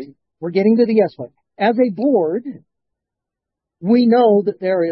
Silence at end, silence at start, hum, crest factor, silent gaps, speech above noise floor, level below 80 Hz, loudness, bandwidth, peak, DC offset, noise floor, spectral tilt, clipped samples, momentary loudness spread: 0 s; 0 s; none; 14 dB; none; 68 dB; -68 dBFS; -16 LUFS; 5.6 kHz; -2 dBFS; under 0.1%; -83 dBFS; -10.5 dB/octave; under 0.1%; 16 LU